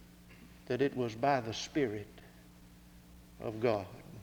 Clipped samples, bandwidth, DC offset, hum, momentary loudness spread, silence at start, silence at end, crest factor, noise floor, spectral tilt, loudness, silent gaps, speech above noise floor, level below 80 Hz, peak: under 0.1%; over 20 kHz; under 0.1%; 60 Hz at -65 dBFS; 24 LU; 0 s; 0 s; 22 dB; -57 dBFS; -5.5 dB/octave; -35 LUFS; none; 23 dB; -62 dBFS; -16 dBFS